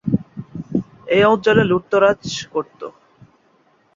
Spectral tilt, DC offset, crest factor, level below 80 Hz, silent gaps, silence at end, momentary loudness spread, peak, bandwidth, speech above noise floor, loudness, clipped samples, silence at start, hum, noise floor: -6 dB/octave; under 0.1%; 18 dB; -52 dBFS; none; 1.05 s; 19 LU; -2 dBFS; 7.6 kHz; 41 dB; -18 LUFS; under 0.1%; 0.05 s; none; -58 dBFS